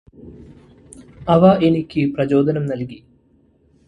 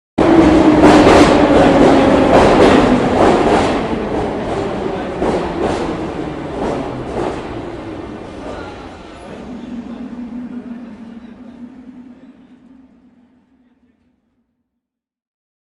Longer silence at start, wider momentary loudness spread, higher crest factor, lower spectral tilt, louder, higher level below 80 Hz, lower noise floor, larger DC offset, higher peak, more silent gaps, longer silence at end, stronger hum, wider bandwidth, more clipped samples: about the same, 0.25 s vs 0.15 s; second, 15 LU vs 23 LU; about the same, 18 dB vs 14 dB; first, -8.5 dB/octave vs -6 dB/octave; second, -17 LUFS vs -12 LUFS; second, -48 dBFS vs -34 dBFS; second, -56 dBFS vs -79 dBFS; neither; about the same, 0 dBFS vs 0 dBFS; neither; second, 0.9 s vs 3.5 s; neither; about the same, 11 kHz vs 11.5 kHz; neither